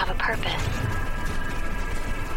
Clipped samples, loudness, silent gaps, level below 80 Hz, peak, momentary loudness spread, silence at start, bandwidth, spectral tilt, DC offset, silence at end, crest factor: under 0.1%; -29 LUFS; none; -30 dBFS; -10 dBFS; 6 LU; 0 s; 16 kHz; -4.5 dB/octave; under 0.1%; 0 s; 14 dB